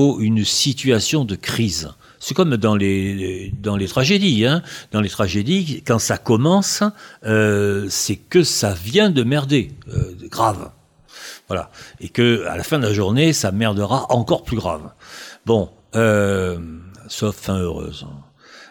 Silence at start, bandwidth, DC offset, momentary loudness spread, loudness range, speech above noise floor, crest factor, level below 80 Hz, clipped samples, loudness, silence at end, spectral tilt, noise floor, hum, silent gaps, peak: 0 s; 18 kHz; under 0.1%; 15 LU; 4 LU; 23 dB; 16 dB; -44 dBFS; under 0.1%; -19 LUFS; 0.05 s; -5 dB/octave; -42 dBFS; none; none; -4 dBFS